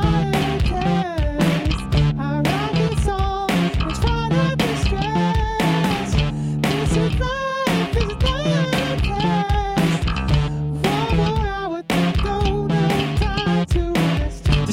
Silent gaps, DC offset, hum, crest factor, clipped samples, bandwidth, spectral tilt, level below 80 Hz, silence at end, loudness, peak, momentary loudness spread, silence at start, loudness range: none; under 0.1%; none; 14 dB; under 0.1%; 16.5 kHz; -6 dB/octave; -26 dBFS; 0 s; -20 LUFS; -6 dBFS; 3 LU; 0 s; 0 LU